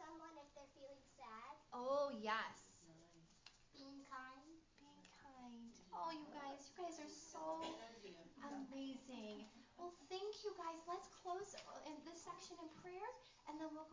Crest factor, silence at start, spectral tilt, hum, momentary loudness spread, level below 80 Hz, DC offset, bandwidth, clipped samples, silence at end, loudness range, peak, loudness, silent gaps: 24 dB; 0 s; -3.5 dB/octave; none; 19 LU; -82 dBFS; under 0.1%; 7.6 kHz; under 0.1%; 0 s; 7 LU; -30 dBFS; -52 LUFS; none